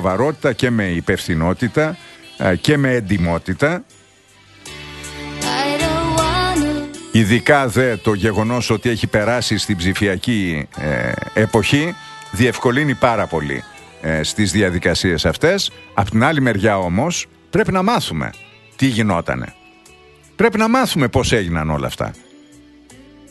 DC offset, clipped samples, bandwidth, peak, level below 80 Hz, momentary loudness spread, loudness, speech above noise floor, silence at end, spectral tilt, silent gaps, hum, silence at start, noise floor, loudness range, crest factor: under 0.1%; under 0.1%; 12.5 kHz; 0 dBFS; -38 dBFS; 10 LU; -17 LUFS; 32 dB; 0.35 s; -5 dB/octave; none; none; 0 s; -49 dBFS; 4 LU; 18 dB